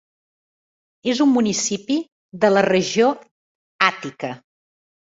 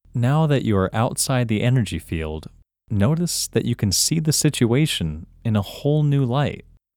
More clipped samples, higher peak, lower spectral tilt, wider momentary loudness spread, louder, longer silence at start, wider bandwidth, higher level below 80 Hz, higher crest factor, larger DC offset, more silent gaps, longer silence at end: neither; first, 0 dBFS vs -6 dBFS; about the same, -4 dB/octave vs -5 dB/octave; first, 14 LU vs 10 LU; about the same, -19 LUFS vs -21 LUFS; first, 1.05 s vs 0.15 s; second, 8 kHz vs 19 kHz; second, -64 dBFS vs -44 dBFS; about the same, 20 dB vs 16 dB; neither; first, 2.12-2.29 s, 3.31-3.79 s vs none; first, 0.7 s vs 0.35 s